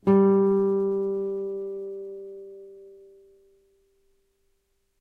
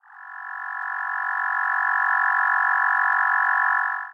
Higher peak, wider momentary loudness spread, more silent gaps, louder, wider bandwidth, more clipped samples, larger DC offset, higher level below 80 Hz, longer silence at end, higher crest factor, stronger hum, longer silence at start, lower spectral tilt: about the same, -8 dBFS vs -10 dBFS; first, 24 LU vs 12 LU; neither; second, -24 LUFS vs -21 LUFS; second, 3.2 kHz vs 8 kHz; neither; neither; first, -68 dBFS vs -84 dBFS; first, 2.05 s vs 0 s; first, 18 dB vs 12 dB; neither; about the same, 0.05 s vs 0.1 s; first, -11 dB/octave vs 2.5 dB/octave